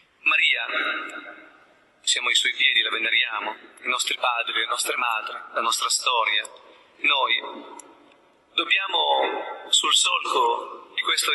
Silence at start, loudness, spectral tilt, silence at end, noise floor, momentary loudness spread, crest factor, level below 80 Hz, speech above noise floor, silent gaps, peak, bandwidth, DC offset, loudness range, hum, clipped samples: 0.25 s; -22 LUFS; 2.5 dB/octave; 0 s; -57 dBFS; 12 LU; 18 dB; -82 dBFS; 33 dB; none; -6 dBFS; 12 kHz; under 0.1%; 3 LU; none; under 0.1%